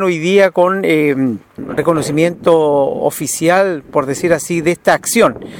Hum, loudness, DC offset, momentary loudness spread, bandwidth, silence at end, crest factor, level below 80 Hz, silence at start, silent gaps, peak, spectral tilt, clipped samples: none; -14 LUFS; under 0.1%; 6 LU; over 20 kHz; 0 s; 14 dB; -50 dBFS; 0 s; none; 0 dBFS; -5 dB/octave; under 0.1%